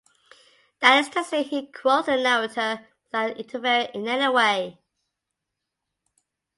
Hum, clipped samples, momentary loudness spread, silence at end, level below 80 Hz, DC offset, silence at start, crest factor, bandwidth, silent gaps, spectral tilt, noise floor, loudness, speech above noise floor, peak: none; under 0.1%; 11 LU; 1.85 s; -74 dBFS; under 0.1%; 0.8 s; 22 dB; 11.5 kHz; none; -2.5 dB/octave; -83 dBFS; -22 LUFS; 60 dB; -4 dBFS